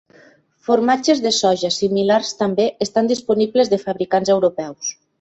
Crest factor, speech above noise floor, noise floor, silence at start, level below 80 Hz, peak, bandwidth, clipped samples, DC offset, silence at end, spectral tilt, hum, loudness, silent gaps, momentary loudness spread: 16 dB; 34 dB; -51 dBFS; 0.7 s; -60 dBFS; -2 dBFS; 8.2 kHz; under 0.1%; under 0.1%; 0.3 s; -4 dB/octave; none; -18 LUFS; none; 7 LU